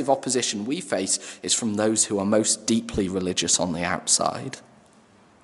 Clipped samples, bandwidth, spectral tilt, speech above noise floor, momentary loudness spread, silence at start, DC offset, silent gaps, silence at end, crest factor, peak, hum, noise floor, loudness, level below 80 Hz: under 0.1%; 12 kHz; -2.5 dB/octave; 31 dB; 6 LU; 0 s; under 0.1%; none; 0.85 s; 20 dB; -6 dBFS; none; -55 dBFS; -23 LUFS; -54 dBFS